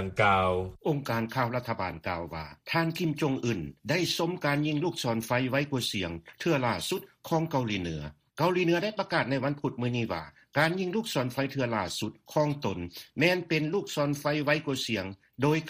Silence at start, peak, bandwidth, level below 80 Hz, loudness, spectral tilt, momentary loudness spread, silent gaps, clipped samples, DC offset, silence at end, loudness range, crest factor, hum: 0 s; -10 dBFS; 15.5 kHz; -58 dBFS; -29 LUFS; -5.5 dB/octave; 8 LU; none; under 0.1%; under 0.1%; 0 s; 2 LU; 20 dB; none